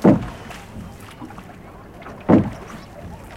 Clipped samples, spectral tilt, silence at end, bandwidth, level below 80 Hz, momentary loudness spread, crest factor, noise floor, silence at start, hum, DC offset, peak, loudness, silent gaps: under 0.1%; -8.5 dB/octave; 0 s; 15 kHz; -42 dBFS; 22 LU; 22 dB; -40 dBFS; 0 s; none; under 0.1%; 0 dBFS; -19 LUFS; none